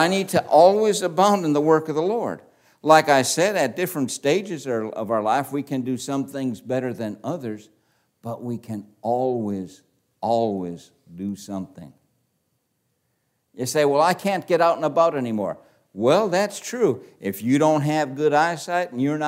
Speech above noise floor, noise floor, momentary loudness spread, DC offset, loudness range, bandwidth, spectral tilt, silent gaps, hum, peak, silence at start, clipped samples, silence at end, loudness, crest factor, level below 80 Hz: 51 dB; -72 dBFS; 14 LU; under 0.1%; 10 LU; 16 kHz; -5 dB/octave; none; none; -2 dBFS; 0 s; under 0.1%; 0 s; -22 LUFS; 22 dB; -72 dBFS